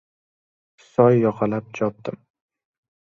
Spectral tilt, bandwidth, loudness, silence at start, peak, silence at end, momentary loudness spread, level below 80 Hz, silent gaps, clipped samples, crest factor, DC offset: -9 dB/octave; 7.2 kHz; -21 LUFS; 1 s; -2 dBFS; 1 s; 15 LU; -62 dBFS; none; under 0.1%; 20 dB; under 0.1%